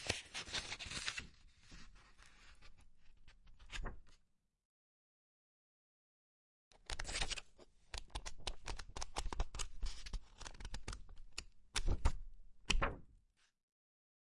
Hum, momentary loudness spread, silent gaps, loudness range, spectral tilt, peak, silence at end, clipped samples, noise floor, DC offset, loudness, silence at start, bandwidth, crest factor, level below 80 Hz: none; 22 LU; 4.65-6.71 s; 14 LU; -2.5 dB/octave; -18 dBFS; 1.05 s; under 0.1%; -76 dBFS; under 0.1%; -45 LUFS; 0 s; 11.5 kHz; 26 dB; -48 dBFS